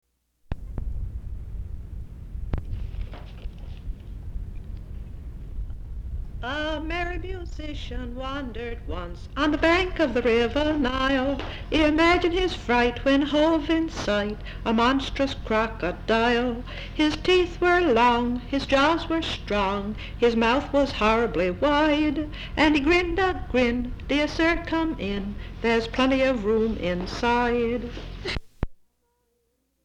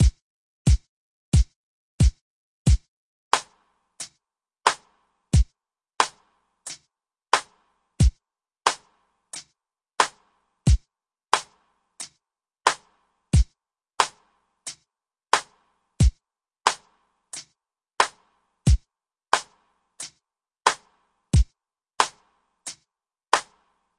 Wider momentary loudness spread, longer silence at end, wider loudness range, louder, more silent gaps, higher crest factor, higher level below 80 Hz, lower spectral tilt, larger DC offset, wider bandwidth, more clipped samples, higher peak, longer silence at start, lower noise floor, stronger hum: about the same, 18 LU vs 16 LU; first, 1.1 s vs 0.55 s; first, 15 LU vs 2 LU; about the same, -24 LUFS vs -25 LUFS; second, none vs 0.22-0.65 s, 0.89-1.32 s, 1.56-1.98 s, 2.21-2.65 s, 2.88-3.31 s; second, 16 dB vs 26 dB; second, -36 dBFS vs -30 dBFS; first, -5.5 dB/octave vs -4 dB/octave; neither; about the same, 10.5 kHz vs 11.5 kHz; neither; second, -8 dBFS vs 0 dBFS; first, 0.5 s vs 0 s; second, -72 dBFS vs -81 dBFS; neither